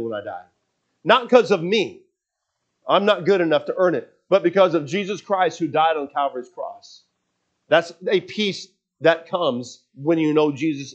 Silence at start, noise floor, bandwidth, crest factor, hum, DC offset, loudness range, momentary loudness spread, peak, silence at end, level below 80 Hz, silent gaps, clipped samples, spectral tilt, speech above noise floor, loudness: 0 s; -79 dBFS; 8.4 kHz; 22 dB; none; under 0.1%; 4 LU; 14 LU; 0 dBFS; 0 s; -80 dBFS; none; under 0.1%; -5.5 dB/octave; 59 dB; -20 LUFS